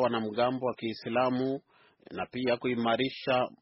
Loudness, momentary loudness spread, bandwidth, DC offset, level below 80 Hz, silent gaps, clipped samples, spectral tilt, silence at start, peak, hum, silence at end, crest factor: -31 LUFS; 9 LU; 5.8 kHz; under 0.1%; -68 dBFS; none; under 0.1%; -3.5 dB/octave; 0 s; -14 dBFS; none; 0.05 s; 16 dB